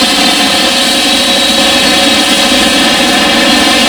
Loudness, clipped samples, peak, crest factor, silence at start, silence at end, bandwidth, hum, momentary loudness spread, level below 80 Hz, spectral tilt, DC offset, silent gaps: -6 LUFS; 0.5%; 0 dBFS; 8 dB; 0 s; 0 s; over 20 kHz; none; 1 LU; -36 dBFS; -1.5 dB/octave; under 0.1%; none